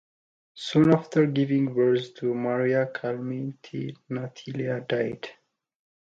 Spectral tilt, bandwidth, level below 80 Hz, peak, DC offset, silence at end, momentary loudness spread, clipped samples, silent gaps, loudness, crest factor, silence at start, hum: -7.5 dB/octave; 7.8 kHz; -66 dBFS; -6 dBFS; under 0.1%; 0.8 s; 14 LU; under 0.1%; none; -26 LUFS; 20 dB; 0.55 s; none